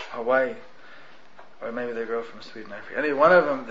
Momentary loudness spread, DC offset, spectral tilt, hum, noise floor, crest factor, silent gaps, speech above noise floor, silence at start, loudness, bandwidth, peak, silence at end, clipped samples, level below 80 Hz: 22 LU; 0.7%; -6 dB/octave; none; -51 dBFS; 20 dB; none; 27 dB; 0 s; -23 LUFS; 7.4 kHz; -6 dBFS; 0 s; under 0.1%; -62 dBFS